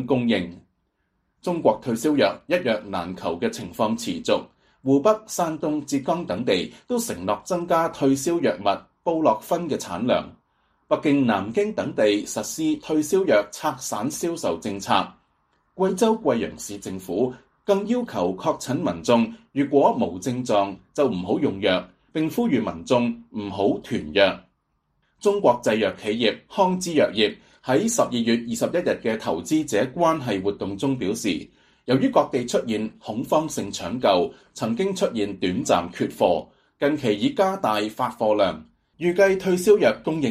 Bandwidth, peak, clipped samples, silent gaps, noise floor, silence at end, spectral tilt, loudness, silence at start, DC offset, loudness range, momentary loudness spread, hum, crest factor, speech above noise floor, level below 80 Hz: 15.5 kHz; -4 dBFS; under 0.1%; none; -72 dBFS; 0 s; -5 dB/octave; -23 LUFS; 0 s; under 0.1%; 2 LU; 8 LU; none; 20 dB; 49 dB; -58 dBFS